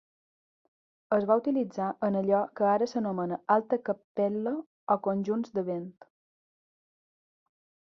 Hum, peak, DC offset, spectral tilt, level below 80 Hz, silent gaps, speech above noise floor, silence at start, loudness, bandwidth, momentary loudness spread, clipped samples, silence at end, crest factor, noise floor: none; -10 dBFS; under 0.1%; -8 dB/octave; -76 dBFS; 4.04-4.15 s, 4.66-4.87 s; over 62 dB; 1.1 s; -29 LUFS; 7 kHz; 8 LU; under 0.1%; 2 s; 20 dB; under -90 dBFS